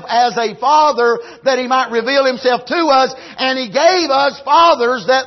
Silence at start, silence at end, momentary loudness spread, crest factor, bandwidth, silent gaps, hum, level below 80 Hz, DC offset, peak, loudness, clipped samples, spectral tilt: 0 s; 0 s; 6 LU; 12 dB; 6.2 kHz; none; none; -62 dBFS; under 0.1%; -2 dBFS; -14 LUFS; under 0.1%; -2.5 dB/octave